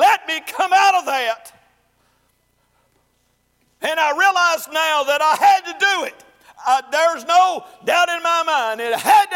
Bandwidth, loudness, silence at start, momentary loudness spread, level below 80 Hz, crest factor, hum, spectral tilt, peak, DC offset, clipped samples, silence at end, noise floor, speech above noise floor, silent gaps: 16.5 kHz; -17 LUFS; 0 s; 9 LU; -70 dBFS; 14 dB; none; 0 dB/octave; -4 dBFS; under 0.1%; under 0.1%; 0 s; -64 dBFS; 47 dB; none